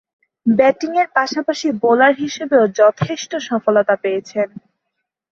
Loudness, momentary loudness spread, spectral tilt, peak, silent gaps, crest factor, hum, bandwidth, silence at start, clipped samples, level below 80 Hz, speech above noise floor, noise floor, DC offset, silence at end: -16 LUFS; 10 LU; -5 dB/octave; -2 dBFS; none; 16 dB; none; 7.6 kHz; 0.45 s; under 0.1%; -58 dBFS; 60 dB; -76 dBFS; under 0.1%; 0.9 s